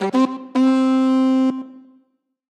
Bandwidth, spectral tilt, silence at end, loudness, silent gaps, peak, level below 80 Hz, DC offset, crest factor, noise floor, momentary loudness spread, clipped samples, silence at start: 8.8 kHz; -6 dB/octave; 0.7 s; -18 LUFS; none; -6 dBFS; -78 dBFS; under 0.1%; 12 dB; -64 dBFS; 10 LU; under 0.1%; 0 s